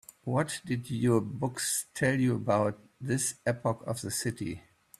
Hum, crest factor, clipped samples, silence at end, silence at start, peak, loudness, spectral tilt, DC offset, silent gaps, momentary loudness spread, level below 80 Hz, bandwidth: none; 18 dB; under 0.1%; 0.4 s; 0.25 s; -12 dBFS; -31 LUFS; -5 dB/octave; under 0.1%; none; 7 LU; -62 dBFS; 15 kHz